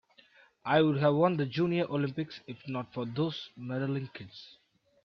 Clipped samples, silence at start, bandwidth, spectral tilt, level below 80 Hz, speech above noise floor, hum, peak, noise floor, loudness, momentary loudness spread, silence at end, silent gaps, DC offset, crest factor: under 0.1%; 0.65 s; 6.4 kHz; -8.5 dB/octave; -70 dBFS; 31 dB; none; -12 dBFS; -62 dBFS; -31 LUFS; 17 LU; 0.6 s; none; under 0.1%; 20 dB